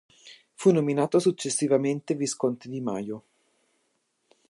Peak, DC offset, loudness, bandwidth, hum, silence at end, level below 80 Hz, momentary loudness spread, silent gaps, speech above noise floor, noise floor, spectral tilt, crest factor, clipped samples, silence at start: -8 dBFS; under 0.1%; -26 LUFS; 11.5 kHz; none; 1.3 s; -76 dBFS; 10 LU; none; 49 dB; -74 dBFS; -5.5 dB/octave; 20 dB; under 0.1%; 0.25 s